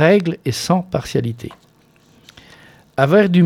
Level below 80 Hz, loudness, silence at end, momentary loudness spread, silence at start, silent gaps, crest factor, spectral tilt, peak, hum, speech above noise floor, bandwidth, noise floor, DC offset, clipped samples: -50 dBFS; -18 LUFS; 0 s; 15 LU; 0 s; none; 16 dB; -6.5 dB/octave; 0 dBFS; none; 37 dB; 15.5 kHz; -53 dBFS; under 0.1%; under 0.1%